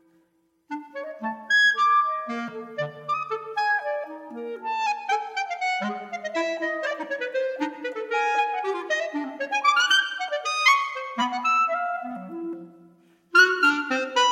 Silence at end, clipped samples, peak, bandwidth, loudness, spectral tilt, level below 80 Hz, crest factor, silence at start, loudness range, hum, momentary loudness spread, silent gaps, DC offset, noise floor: 0 s; under 0.1%; -4 dBFS; 16 kHz; -24 LUFS; -2 dB/octave; -82 dBFS; 22 dB; 0.7 s; 6 LU; none; 16 LU; none; under 0.1%; -67 dBFS